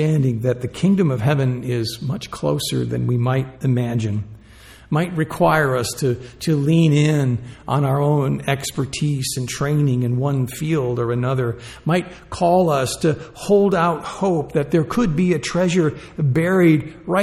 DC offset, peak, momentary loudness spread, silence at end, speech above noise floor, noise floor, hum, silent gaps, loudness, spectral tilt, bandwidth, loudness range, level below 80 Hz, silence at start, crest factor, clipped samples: under 0.1%; -4 dBFS; 8 LU; 0 s; 25 dB; -44 dBFS; none; none; -20 LUFS; -6.5 dB/octave; 15 kHz; 3 LU; -46 dBFS; 0 s; 16 dB; under 0.1%